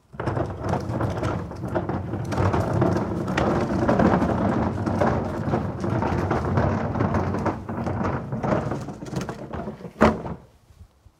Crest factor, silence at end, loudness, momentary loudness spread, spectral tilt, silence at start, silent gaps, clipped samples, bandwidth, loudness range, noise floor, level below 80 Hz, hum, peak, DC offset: 22 dB; 0.35 s; -25 LUFS; 10 LU; -8 dB/octave; 0.15 s; none; under 0.1%; 12.5 kHz; 4 LU; -51 dBFS; -42 dBFS; none; -2 dBFS; under 0.1%